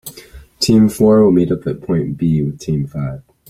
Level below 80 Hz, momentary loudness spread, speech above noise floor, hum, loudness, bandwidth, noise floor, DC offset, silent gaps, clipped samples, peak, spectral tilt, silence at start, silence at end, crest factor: -42 dBFS; 12 LU; 25 dB; none; -15 LUFS; 16.5 kHz; -39 dBFS; under 0.1%; none; under 0.1%; -2 dBFS; -7 dB/octave; 0.05 s; 0.3 s; 14 dB